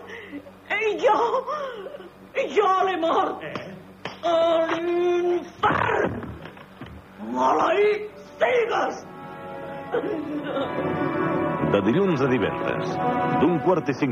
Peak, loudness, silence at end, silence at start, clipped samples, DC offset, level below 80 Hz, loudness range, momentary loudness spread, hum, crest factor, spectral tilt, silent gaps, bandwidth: -8 dBFS; -23 LUFS; 0 s; 0 s; under 0.1%; under 0.1%; -56 dBFS; 3 LU; 17 LU; none; 16 dB; -6.5 dB/octave; none; 8 kHz